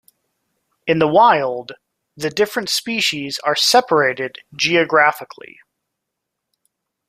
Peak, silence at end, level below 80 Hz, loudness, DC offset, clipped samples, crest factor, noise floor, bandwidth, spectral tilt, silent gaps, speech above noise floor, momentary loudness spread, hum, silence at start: -2 dBFS; 1.85 s; -62 dBFS; -16 LUFS; under 0.1%; under 0.1%; 18 dB; -79 dBFS; 15.5 kHz; -3 dB/octave; none; 62 dB; 15 LU; none; 0.85 s